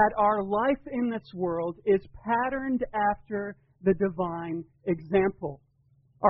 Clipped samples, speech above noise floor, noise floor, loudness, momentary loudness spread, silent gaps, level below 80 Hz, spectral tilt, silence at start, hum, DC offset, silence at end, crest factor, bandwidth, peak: under 0.1%; 37 dB; -64 dBFS; -28 LUFS; 9 LU; none; -54 dBFS; -6 dB/octave; 0 s; none; under 0.1%; 0 s; 20 dB; 4.7 kHz; -8 dBFS